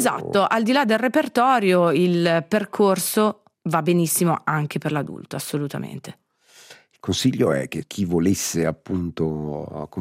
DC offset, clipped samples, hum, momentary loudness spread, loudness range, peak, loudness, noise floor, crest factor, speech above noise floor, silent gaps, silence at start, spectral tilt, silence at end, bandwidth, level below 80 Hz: under 0.1%; under 0.1%; none; 13 LU; 7 LU; -4 dBFS; -21 LUFS; -51 dBFS; 16 dB; 30 dB; none; 0 s; -5 dB/octave; 0 s; 16 kHz; -58 dBFS